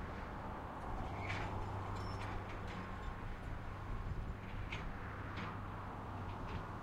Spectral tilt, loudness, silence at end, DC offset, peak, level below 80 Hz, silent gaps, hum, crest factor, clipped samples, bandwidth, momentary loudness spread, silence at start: -6.5 dB/octave; -46 LUFS; 0 s; under 0.1%; -28 dBFS; -50 dBFS; none; none; 16 dB; under 0.1%; 13.5 kHz; 5 LU; 0 s